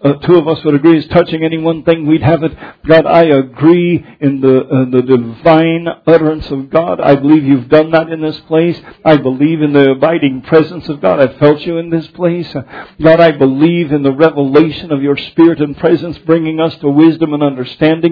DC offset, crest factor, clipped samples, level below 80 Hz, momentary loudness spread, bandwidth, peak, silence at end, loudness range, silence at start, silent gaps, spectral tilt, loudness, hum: under 0.1%; 10 dB; 0.7%; -42 dBFS; 7 LU; 5.4 kHz; 0 dBFS; 0 s; 1 LU; 0 s; none; -10 dB/octave; -11 LUFS; none